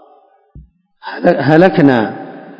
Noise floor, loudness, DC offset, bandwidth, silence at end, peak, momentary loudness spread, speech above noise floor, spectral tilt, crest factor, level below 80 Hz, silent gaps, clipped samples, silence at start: -49 dBFS; -11 LUFS; under 0.1%; 7 kHz; 0.05 s; 0 dBFS; 20 LU; 38 dB; -9 dB/octave; 14 dB; -50 dBFS; none; 0.9%; 0.55 s